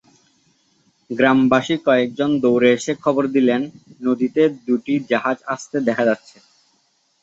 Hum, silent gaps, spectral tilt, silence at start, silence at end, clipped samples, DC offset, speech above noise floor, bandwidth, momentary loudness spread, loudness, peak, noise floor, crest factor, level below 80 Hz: none; none; -5.5 dB/octave; 1.1 s; 1.05 s; under 0.1%; under 0.1%; 45 dB; 8 kHz; 9 LU; -18 LUFS; -2 dBFS; -63 dBFS; 18 dB; -62 dBFS